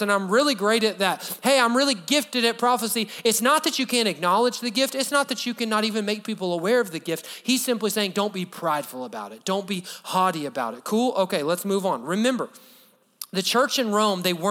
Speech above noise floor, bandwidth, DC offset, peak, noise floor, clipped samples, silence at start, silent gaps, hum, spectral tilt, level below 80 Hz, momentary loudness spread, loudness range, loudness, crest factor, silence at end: 33 dB; over 20 kHz; under 0.1%; -4 dBFS; -56 dBFS; under 0.1%; 0 s; none; none; -3 dB/octave; -82 dBFS; 9 LU; 5 LU; -23 LUFS; 18 dB; 0 s